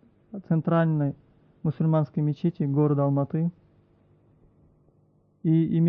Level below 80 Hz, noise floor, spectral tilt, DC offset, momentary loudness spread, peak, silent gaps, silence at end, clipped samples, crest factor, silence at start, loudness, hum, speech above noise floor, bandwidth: -64 dBFS; -63 dBFS; -12 dB/octave; under 0.1%; 9 LU; -12 dBFS; none; 0 s; under 0.1%; 14 dB; 0.35 s; -25 LUFS; none; 40 dB; 4 kHz